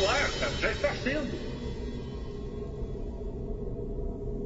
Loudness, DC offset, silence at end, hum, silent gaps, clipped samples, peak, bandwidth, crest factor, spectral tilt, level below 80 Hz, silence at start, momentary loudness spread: -33 LUFS; under 0.1%; 0 s; none; none; under 0.1%; -14 dBFS; 8 kHz; 18 dB; -4.5 dB/octave; -38 dBFS; 0 s; 10 LU